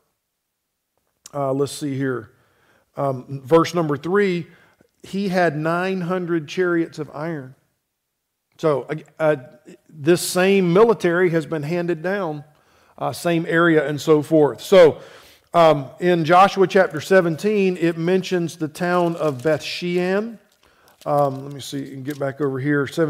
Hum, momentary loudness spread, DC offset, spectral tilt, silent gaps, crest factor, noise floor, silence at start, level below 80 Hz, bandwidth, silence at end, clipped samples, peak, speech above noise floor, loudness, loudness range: none; 14 LU; under 0.1%; -6 dB/octave; none; 16 dB; -76 dBFS; 1.35 s; -62 dBFS; 16 kHz; 0 s; under 0.1%; -4 dBFS; 57 dB; -19 LUFS; 8 LU